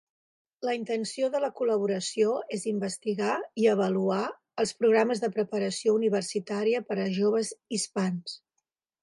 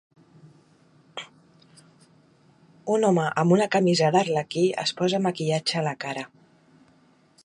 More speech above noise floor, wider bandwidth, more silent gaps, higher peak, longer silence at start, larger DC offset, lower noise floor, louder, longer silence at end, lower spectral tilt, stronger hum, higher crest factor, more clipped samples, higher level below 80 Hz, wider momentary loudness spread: first, 55 dB vs 37 dB; about the same, 11.5 kHz vs 11 kHz; neither; second, -10 dBFS vs -6 dBFS; second, 0.6 s vs 1.15 s; neither; first, -82 dBFS vs -59 dBFS; second, -28 LUFS vs -23 LUFS; second, 0.65 s vs 1.2 s; about the same, -5 dB/octave vs -5.5 dB/octave; neither; about the same, 18 dB vs 20 dB; neither; second, -78 dBFS vs -72 dBFS; second, 7 LU vs 19 LU